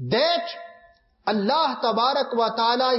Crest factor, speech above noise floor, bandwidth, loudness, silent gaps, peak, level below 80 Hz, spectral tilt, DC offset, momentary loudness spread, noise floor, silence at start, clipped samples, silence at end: 14 dB; 34 dB; 6 kHz; -22 LUFS; none; -10 dBFS; -68 dBFS; -7 dB/octave; under 0.1%; 9 LU; -56 dBFS; 0 s; under 0.1%; 0 s